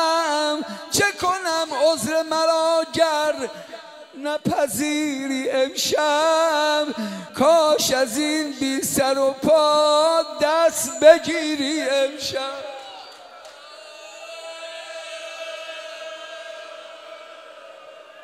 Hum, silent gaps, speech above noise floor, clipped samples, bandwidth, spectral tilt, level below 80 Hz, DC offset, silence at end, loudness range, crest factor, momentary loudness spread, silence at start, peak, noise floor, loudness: none; none; 23 dB; under 0.1%; 16 kHz; -2.5 dB/octave; -62 dBFS; under 0.1%; 0 s; 17 LU; 20 dB; 22 LU; 0 s; 0 dBFS; -43 dBFS; -20 LUFS